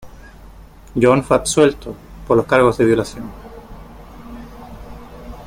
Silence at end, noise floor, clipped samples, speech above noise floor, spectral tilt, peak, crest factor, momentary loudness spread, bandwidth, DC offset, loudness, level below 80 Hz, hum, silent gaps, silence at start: 0 s; -40 dBFS; under 0.1%; 25 dB; -5.5 dB/octave; 0 dBFS; 18 dB; 24 LU; 16.5 kHz; under 0.1%; -15 LUFS; -40 dBFS; none; none; 0.05 s